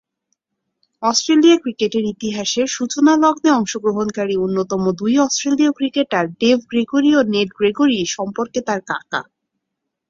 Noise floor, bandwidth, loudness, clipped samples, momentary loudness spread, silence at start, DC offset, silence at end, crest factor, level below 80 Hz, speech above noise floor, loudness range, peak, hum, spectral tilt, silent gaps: -78 dBFS; 7.6 kHz; -17 LUFS; under 0.1%; 9 LU; 1 s; under 0.1%; 0.9 s; 16 dB; -58 dBFS; 62 dB; 2 LU; -2 dBFS; none; -4 dB/octave; none